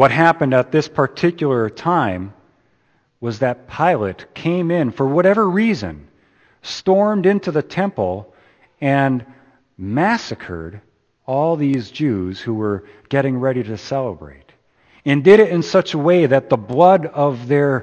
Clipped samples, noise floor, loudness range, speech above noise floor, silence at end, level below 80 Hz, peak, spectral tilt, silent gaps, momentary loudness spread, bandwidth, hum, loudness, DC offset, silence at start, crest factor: under 0.1%; -61 dBFS; 7 LU; 44 dB; 0 s; -54 dBFS; 0 dBFS; -7 dB/octave; none; 15 LU; 8.6 kHz; none; -17 LUFS; under 0.1%; 0 s; 18 dB